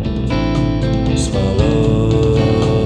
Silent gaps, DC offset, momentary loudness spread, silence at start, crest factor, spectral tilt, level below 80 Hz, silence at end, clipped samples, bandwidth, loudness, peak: none; under 0.1%; 3 LU; 0 s; 12 dB; -7 dB/octave; -24 dBFS; 0 s; under 0.1%; 10.5 kHz; -15 LUFS; -2 dBFS